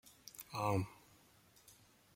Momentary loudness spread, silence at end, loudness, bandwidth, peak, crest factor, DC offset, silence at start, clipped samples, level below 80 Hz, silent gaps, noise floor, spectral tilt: 25 LU; 0.45 s; -41 LUFS; 16.5 kHz; -24 dBFS; 22 dB; under 0.1%; 0.05 s; under 0.1%; -72 dBFS; none; -68 dBFS; -6 dB/octave